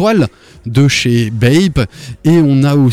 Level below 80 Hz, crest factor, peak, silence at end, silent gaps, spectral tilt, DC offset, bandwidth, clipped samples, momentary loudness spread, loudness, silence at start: -34 dBFS; 8 dB; -2 dBFS; 0 s; none; -6.5 dB/octave; under 0.1%; 14 kHz; under 0.1%; 9 LU; -12 LUFS; 0 s